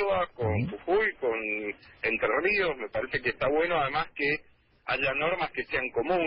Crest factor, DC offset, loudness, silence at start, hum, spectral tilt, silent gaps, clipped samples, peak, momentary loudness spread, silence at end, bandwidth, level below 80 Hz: 16 dB; under 0.1%; -28 LUFS; 0 s; none; -9.5 dB/octave; none; under 0.1%; -14 dBFS; 6 LU; 0 s; 5.6 kHz; -52 dBFS